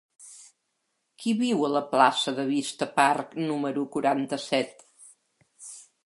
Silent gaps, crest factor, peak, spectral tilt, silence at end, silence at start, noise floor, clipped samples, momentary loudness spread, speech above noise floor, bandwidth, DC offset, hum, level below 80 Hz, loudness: none; 22 dB; -6 dBFS; -4 dB/octave; 0.25 s; 0.2 s; -77 dBFS; under 0.1%; 21 LU; 52 dB; 11.5 kHz; under 0.1%; none; -78 dBFS; -26 LUFS